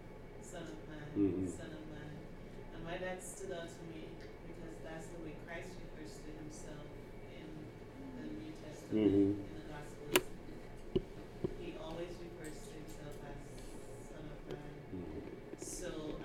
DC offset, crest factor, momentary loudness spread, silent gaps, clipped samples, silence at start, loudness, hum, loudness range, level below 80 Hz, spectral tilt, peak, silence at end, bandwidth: under 0.1%; 32 dB; 16 LU; none; under 0.1%; 0 s; -43 LUFS; none; 12 LU; -54 dBFS; -5 dB/octave; -10 dBFS; 0 s; 16 kHz